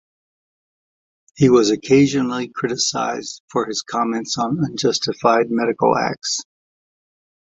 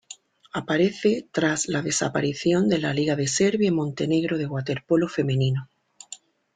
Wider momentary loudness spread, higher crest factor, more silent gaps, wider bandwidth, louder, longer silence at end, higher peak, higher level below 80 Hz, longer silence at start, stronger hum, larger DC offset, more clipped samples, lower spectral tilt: second, 9 LU vs 14 LU; about the same, 18 dB vs 16 dB; first, 3.40-3.48 s vs none; second, 8.2 kHz vs 9.6 kHz; first, -19 LUFS vs -24 LUFS; first, 1.15 s vs 0.4 s; first, -2 dBFS vs -8 dBFS; about the same, -58 dBFS vs -60 dBFS; first, 1.35 s vs 0.1 s; neither; neither; neither; about the same, -4.5 dB/octave vs -5 dB/octave